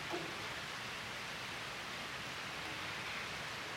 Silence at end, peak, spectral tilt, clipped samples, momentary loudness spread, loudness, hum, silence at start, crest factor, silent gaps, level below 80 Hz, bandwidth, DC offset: 0 s; -28 dBFS; -2.5 dB/octave; under 0.1%; 2 LU; -42 LUFS; none; 0 s; 16 dB; none; -68 dBFS; 16 kHz; under 0.1%